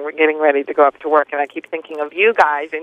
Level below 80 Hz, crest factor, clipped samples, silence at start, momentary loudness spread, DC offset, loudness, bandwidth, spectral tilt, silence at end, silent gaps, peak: -64 dBFS; 16 dB; under 0.1%; 0 s; 12 LU; under 0.1%; -16 LUFS; 7.6 kHz; -4 dB/octave; 0 s; none; 0 dBFS